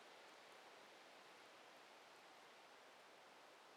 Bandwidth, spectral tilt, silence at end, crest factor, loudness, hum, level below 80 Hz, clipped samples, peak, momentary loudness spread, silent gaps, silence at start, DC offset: 14.5 kHz; -1.5 dB/octave; 0 s; 14 dB; -63 LUFS; none; under -90 dBFS; under 0.1%; -52 dBFS; 2 LU; none; 0 s; under 0.1%